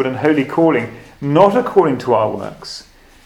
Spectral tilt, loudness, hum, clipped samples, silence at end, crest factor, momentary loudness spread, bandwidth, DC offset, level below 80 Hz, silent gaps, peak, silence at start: -7 dB/octave; -15 LUFS; none; under 0.1%; 0.45 s; 16 dB; 18 LU; 12.5 kHz; under 0.1%; -50 dBFS; none; 0 dBFS; 0 s